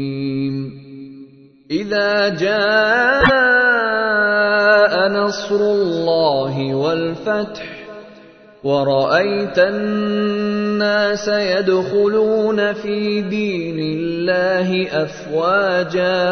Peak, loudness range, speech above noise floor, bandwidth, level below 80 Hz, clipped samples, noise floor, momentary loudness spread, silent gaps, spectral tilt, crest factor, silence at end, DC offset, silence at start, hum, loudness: 0 dBFS; 5 LU; 27 dB; 6.6 kHz; -48 dBFS; under 0.1%; -43 dBFS; 10 LU; none; -5.5 dB/octave; 16 dB; 0 s; under 0.1%; 0 s; none; -17 LUFS